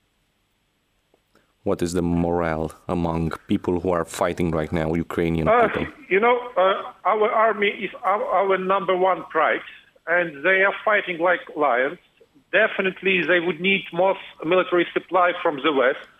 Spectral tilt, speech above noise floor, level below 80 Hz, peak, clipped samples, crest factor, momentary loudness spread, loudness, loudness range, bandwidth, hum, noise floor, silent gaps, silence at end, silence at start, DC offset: -6 dB/octave; 47 dB; -48 dBFS; -6 dBFS; under 0.1%; 16 dB; 7 LU; -21 LUFS; 4 LU; 15.5 kHz; none; -68 dBFS; none; 0.15 s; 1.65 s; under 0.1%